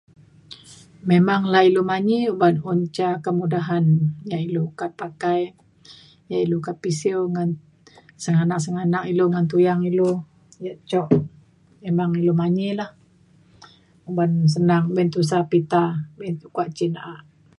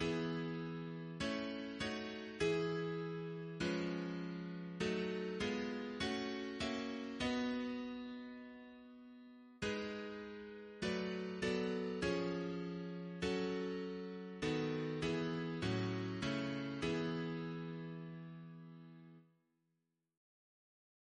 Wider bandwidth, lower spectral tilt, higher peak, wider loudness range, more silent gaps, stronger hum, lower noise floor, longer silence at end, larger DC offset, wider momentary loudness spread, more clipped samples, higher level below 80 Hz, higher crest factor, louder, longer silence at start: first, 11.5 kHz vs 10 kHz; first, -7.5 dB/octave vs -6 dB/octave; first, -2 dBFS vs -24 dBFS; about the same, 5 LU vs 6 LU; neither; neither; second, -55 dBFS vs -86 dBFS; second, 0.4 s vs 1.9 s; neither; about the same, 13 LU vs 13 LU; neither; about the same, -62 dBFS vs -66 dBFS; about the same, 18 dB vs 18 dB; first, -21 LUFS vs -42 LUFS; first, 0.5 s vs 0 s